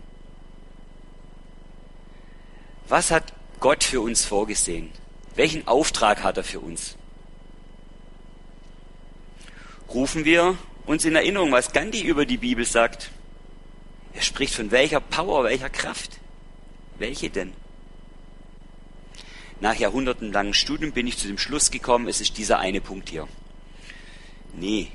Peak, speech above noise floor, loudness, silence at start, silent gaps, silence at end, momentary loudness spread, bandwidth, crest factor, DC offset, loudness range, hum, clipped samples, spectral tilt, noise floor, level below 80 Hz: -2 dBFS; 20 dB; -23 LUFS; 0 s; none; 0 s; 18 LU; 11.5 kHz; 24 dB; under 0.1%; 10 LU; none; under 0.1%; -2.5 dB/octave; -43 dBFS; -40 dBFS